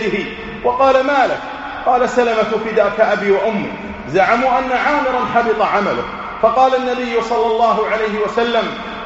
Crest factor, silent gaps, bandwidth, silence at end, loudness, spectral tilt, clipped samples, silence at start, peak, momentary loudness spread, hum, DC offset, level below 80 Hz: 16 dB; none; 8 kHz; 0 s; -16 LUFS; -2.5 dB/octave; under 0.1%; 0 s; 0 dBFS; 9 LU; none; under 0.1%; -44 dBFS